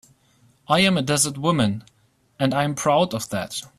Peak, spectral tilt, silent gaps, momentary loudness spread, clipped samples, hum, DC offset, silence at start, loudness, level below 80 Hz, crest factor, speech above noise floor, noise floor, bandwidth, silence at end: -6 dBFS; -4 dB/octave; none; 9 LU; under 0.1%; none; under 0.1%; 0.7 s; -21 LUFS; -56 dBFS; 18 dB; 38 dB; -59 dBFS; 15 kHz; 0.1 s